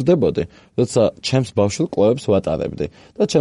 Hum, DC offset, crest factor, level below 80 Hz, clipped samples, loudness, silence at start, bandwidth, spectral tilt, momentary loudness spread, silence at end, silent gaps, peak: none; under 0.1%; 16 dB; -46 dBFS; under 0.1%; -19 LUFS; 0 s; 11.5 kHz; -6 dB/octave; 9 LU; 0 s; none; -2 dBFS